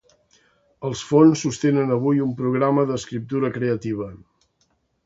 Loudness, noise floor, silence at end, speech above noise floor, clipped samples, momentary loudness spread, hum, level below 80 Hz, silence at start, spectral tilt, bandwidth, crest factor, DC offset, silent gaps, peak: -21 LUFS; -67 dBFS; 0.9 s; 47 dB; under 0.1%; 14 LU; none; -58 dBFS; 0.8 s; -6.5 dB/octave; 8 kHz; 20 dB; under 0.1%; none; -2 dBFS